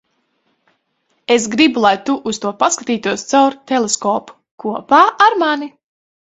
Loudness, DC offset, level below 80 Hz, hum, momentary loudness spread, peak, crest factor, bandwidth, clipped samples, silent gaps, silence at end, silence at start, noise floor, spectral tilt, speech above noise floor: -15 LUFS; under 0.1%; -62 dBFS; none; 12 LU; 0 dBFS; 16 dB; 8.4 kHz; under 0.1%; 4.51-4.58 s; 0.7 s; 1.3 s; -65 dBFS; -2.5 dB/octave; 51 dB